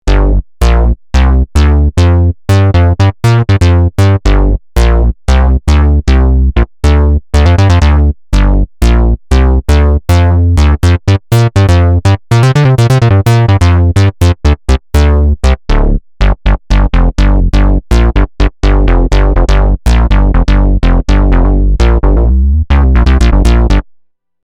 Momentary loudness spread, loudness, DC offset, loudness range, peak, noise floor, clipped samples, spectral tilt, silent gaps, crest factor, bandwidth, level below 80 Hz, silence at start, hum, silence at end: 4 LU; -9 LUFS; under 0.1%; 3 LU; 0 dBFS; -47 dBFS; under 0.1%; -7 dB/octave; none; 6 dB; 12 kHz; -10 dBFS; 0.05 s; none; 0.65 s